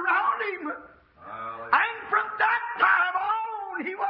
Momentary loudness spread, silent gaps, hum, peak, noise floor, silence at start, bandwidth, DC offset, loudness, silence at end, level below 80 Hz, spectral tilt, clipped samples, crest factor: 15 LU; none; none; -6 dBFS; -49 dBFS; 0 s; 5.6 kHz; under 0.1%; -25 LUFS; 0 s; -70 dBFS; -6.5 dB/octave; under 0.1%; 22 dB